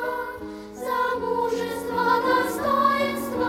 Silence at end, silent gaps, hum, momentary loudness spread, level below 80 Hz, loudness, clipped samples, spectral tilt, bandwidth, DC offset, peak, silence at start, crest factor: 0 s; none; none; 13 LU; -54 dBFS; -24 LUFS; under 0.1%; -4.5 dB/octave; 16.5 kHz; under 0.1%; -8 dBFS; 0 s; 16 dB